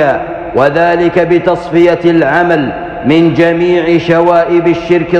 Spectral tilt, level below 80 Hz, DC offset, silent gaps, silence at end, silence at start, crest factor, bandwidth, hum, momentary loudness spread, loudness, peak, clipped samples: -7.5 dB/octave; -38 dBFS; under 0.1%; none; 0 s; 0 s; 10 dB; 7.2 kHz; none; 4 LU; -10 LUFS; 0 dBFS; under 0.1%